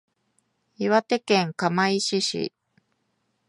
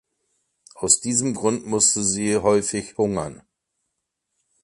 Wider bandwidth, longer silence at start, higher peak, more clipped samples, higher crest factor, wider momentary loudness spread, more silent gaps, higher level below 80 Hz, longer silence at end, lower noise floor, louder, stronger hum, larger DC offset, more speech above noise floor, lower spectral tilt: about the same, 11.5 kHz vs 11.5 kHz; about the same, 0.8 s vs 0.75 s; second, -6 dBFS vs -2 dBFS; neither; about the same, 20 dB vs 22 dB; about the same, 8 LU vs 10 LU; neither; second, -72 dBFS vs -54 dBFS; second, 1 s vs 1.3 s; second, -73 dBFS vs -79 dBFS; second, -24 LUFS vs -20 LUFS; neither; neither; second, 50 dB vs 57 dB; about the same, -4 dB/octave vs -3.5 dB/octave